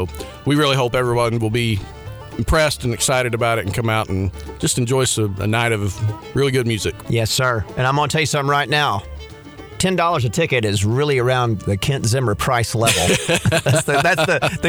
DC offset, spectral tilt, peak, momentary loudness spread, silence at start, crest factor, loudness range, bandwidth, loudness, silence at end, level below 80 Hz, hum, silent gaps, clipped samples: under 0.1%; -4.5 dB/octave; -4 dBFS; 9 LU; 0 s; 16 dB; 2 LU; over 20 kHz; -18 LUFS; 0 s; -36 dBFS; none; none; under 0.1%